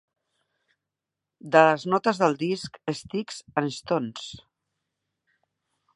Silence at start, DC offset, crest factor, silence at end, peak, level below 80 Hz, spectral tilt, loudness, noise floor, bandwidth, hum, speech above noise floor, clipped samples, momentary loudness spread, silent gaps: 1.45 s; under 0.1%; 26 dB; 1.6 s; -2 dBFS; -68 dBFS; -5 dB/octave; -25 LUFS; -87 dBFS; 11.5 kHz; none; 62 dB; under 0.1%; 14 LU; none